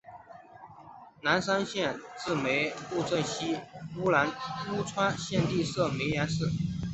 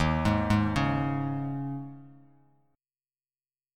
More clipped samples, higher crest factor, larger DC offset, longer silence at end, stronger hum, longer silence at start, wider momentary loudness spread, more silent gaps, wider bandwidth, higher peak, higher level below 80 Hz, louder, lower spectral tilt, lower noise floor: neither; about the same, 20 dB vs 18 dB; neither; second, 0 s vs 1.65 s; neither; about the same, 0.05 s vs 0 s; first, 20 LU vs 12 LU; neither; second, 8.2 kHz vs 12.5 kHz; about the same, -10 dBFS vs -12 dBFS; second, -56 dBFS vs -44 dBFS; about the same, -30 LUFS vs -29 LUFS; second, -5 dB/octave vs -7 dB/octave; second, -51 dBFS vs under -90 dBFS